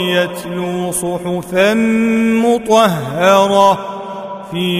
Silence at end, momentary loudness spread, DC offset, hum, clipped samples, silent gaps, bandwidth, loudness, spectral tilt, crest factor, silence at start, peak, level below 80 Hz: 0 s; 13 LU; under 0.1%; none; under 0.1%; none; 16 kHz; -14 LUFS; -5 dB/octave; 14 dB; 0 s; 0 dBFS; -48 dBFS